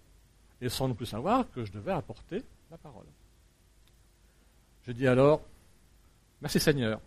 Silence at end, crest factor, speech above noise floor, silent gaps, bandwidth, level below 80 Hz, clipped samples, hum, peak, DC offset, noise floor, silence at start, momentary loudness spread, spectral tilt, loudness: 0.05 s; 22 dB; 33 dB; none; 15.5 kHz; -54 dBFS; under 0.1%; none; -10 dBFS; under 0.1%; -62 dBFS; 0.6 s; 25 LU; -5.5 dB/octave; -30 LUFS